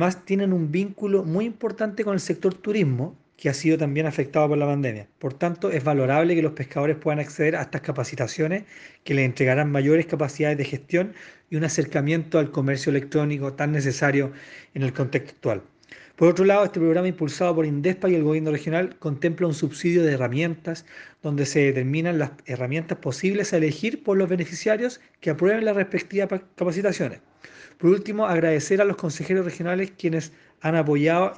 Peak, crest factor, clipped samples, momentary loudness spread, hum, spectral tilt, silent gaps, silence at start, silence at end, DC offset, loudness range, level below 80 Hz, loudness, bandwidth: -6 dBFS; 18 dB; under 0.1%; 8 LU; none; -6.5 dB/octave; none; 0 s; 0 s; under 0.1%; 2 LU; -66 dBFS; -24 LUFS; 9.8 kHz